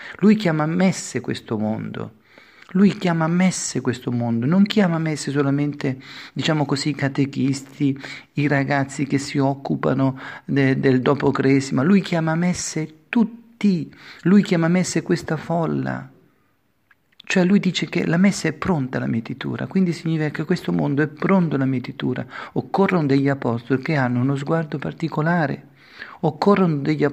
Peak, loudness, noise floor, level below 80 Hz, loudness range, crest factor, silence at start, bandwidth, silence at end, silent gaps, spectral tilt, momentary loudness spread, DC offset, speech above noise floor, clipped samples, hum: -2 dBFS; -21 LUFS; -65 dBFS; -58 dBFS; 3 LU; 18 dB; 0 s; 11 kHz; 0 s; none; -6 dB/octave; 9 LU; under 0.1%; 45 dB; under 0.1%; none